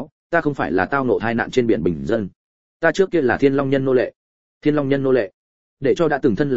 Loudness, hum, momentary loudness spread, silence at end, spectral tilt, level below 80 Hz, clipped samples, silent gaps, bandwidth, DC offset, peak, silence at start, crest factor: -19 LUFS; none; 6 LU; 0 s; -7 dB/octave; -50 dBFS; under 0.1%; 0.12-0.30 s, 2.35-2.80 s, 4.16-4.61 s, 5.34-5.77 s; 7.8 kHz; 0.9%; -2 dBFS; 0 s; 18 dB